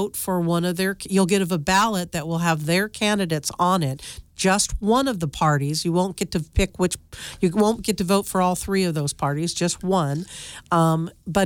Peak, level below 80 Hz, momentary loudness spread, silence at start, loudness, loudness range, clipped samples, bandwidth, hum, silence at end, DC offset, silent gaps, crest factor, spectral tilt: -6 dBFS; -40 dBFS; 7 LU; 0 s; -22 LUFS; 1 LU; under 0.1%; 18.5 kHz; none; 0 s; under 0.1%; none; 16 dB; -5 dB/octave